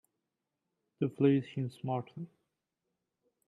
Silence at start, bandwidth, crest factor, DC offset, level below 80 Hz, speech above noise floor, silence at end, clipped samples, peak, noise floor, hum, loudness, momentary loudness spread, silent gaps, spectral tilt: 1 s; 11 kHz; 22 dB; under 0.1%; -78 dBFS; 55 dB; 1.2 s; under 0.1%; -16 dBFS; -87 dBFS; none; -33 LUFS; 19 LU; none; -9.5 dB/octave